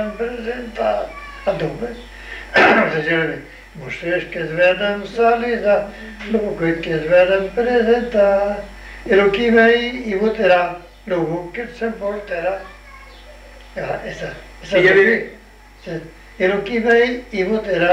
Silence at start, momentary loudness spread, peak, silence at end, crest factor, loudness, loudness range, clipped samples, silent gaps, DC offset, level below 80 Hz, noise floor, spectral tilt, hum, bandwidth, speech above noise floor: 0 s; 18 LU; -2 dBFS; 0 s; 16 dB; -17 LUFS; 6 LU; under 0.1%; none; under 0.1%; -42 dBFS; -40 dBFS; -6 dB/octave; none; 10.5 kHz; 22 dB